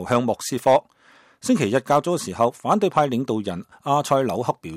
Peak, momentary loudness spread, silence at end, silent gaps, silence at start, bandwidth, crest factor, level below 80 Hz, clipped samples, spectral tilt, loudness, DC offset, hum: -6 dBFS; 7 LU; 0 s; none; 0 s; 16 kHz; 16 dB; -62 dBFS; under 0.1%; -5.5 dB/octave; -22 LUFS; under 0.1%; none